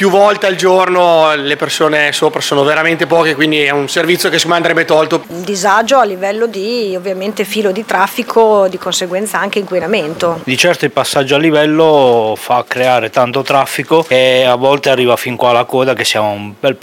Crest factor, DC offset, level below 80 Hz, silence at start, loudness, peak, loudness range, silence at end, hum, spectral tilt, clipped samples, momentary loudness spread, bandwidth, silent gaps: 12 dB; under 0.1%; -58 dBFS; 0 s; -11 LUFS; 0 dBFS; 3 LU; 0.05 s; none; -4 dB/octave; 0.7%; 7 LU; 17 kHz; none